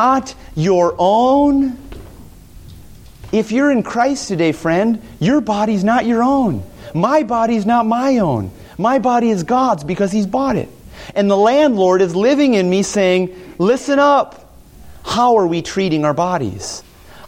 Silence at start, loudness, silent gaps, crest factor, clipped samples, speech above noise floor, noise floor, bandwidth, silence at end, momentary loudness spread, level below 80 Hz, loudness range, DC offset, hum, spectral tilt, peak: 0 s; -15 LUFS; none; 14 dB; under 0.1%; 25 dB; -39 dBFS; 16 kHz; 0 s; 10 LU; -44 dBFS; 3 LU; under 0.1%; none; -6 dB/octave; -2 dBFS